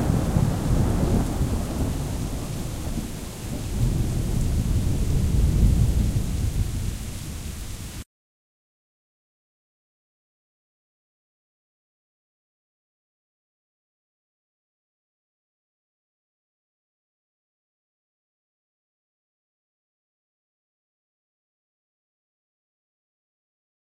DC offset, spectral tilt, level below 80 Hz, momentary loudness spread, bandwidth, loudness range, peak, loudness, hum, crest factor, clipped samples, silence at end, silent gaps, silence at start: under 0.1%; -6.5 dB/octave; -32 dBFS; 12 LU; 16 kHz; 15 LU; -6 dBFS; -26 LUFS; none; 22 dB; under 0.1%; 15.95 s; none; 0 s